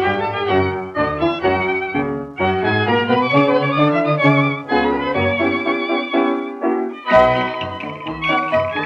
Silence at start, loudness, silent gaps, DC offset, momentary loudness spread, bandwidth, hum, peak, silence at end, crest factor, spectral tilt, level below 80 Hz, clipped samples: 0 s; -17 LUFS; none; under 0.1%; 7 LU; 7.6 kHz; none; 0 dBFS; 0 s; 16 dB; -7.5 dB/octave; -46 dBFS; under 0.1%